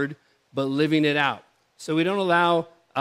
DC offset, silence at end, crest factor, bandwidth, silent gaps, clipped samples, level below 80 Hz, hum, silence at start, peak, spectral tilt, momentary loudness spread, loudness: under 0.1%; 0 s; 18 dB; 13.5 kHz; none; under 0.1%; -76 dBFS; none; 0 s; -6 dBFS; -6 dB/octave; 13 LU; -23 LUFS